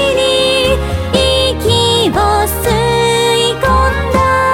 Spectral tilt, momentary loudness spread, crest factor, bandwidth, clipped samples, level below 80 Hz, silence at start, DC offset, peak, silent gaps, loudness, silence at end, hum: -4 dB/octave; 3 LU; 12 dB; 17 kHz; under 0.1%; -22 dBFS; 0 s; under 0.1%; 0 dBFS; none; -11 LUFS; 0 s; none